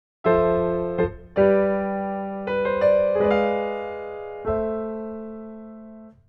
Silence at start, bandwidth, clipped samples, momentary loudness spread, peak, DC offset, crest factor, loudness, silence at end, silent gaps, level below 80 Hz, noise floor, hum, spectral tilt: 0.25 s; 5.8 kHz; under 0.1%; 17 LU; -6 dBFS; under 0.1%; 18 dB; -23 LUFS; 0.15 s; none; -48 dBFS; -43 dBFS; none; -9.5 dB/octave